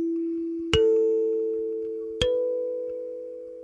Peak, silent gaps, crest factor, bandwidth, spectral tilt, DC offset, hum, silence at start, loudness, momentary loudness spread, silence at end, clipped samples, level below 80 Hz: -4 dBFS; none; 22 dB; 11 kHz; -5.5 dB/octave; under 0.1%; none; 0 s; -26 LUFS; 13 LU; 0 s; under 0.1%; -48 dBFS